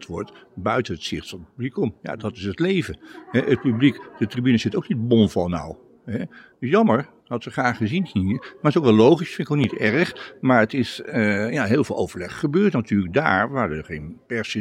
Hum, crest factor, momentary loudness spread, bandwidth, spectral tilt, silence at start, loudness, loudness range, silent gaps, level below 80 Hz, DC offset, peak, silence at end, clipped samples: none; 20 dB; 13 LU; 12 kHz; -7 dB/octave; 0 s; -22 LUFS; 4 LU; none; -56 dBFS; under 0.1%; -2 dBFS; 0 s; under 0.1%